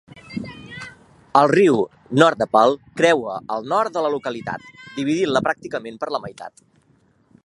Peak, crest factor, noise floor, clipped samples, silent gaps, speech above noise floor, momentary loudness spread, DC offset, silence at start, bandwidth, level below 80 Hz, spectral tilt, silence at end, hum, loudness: 0 dBFS; 20 dB; -59 dBFS; under 0.1%; none; 40 dB; 19 LU; under 0.1%; 0.15 s; 11.5 kHz; -60 dBFS; -5.5 dB/octave; 0.95 s; none; -19 LUFS